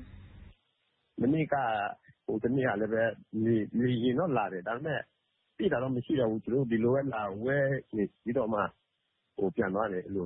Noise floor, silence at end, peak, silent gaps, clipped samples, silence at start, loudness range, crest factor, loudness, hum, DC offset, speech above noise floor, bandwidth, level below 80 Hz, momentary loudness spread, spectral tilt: -79 dBFS; 0 s; -14 dBFS; none; under 0.1%; 0 s; 2 LU; 16 dB; -31 LUFS; none; under 0.1%; 49 dB; 4 kHz; -62 dBFS; 7 LU; -11 dB/octave